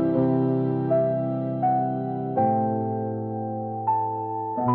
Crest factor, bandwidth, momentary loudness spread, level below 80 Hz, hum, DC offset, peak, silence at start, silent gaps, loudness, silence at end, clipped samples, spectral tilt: 14 dB; 4.2 kHz; 7 LU; -64 dBFS; none; under 0.1%; -10 dBFS; 0 s; none; -25 LUFS; 0 s; under 0.1%; -13 dB/octave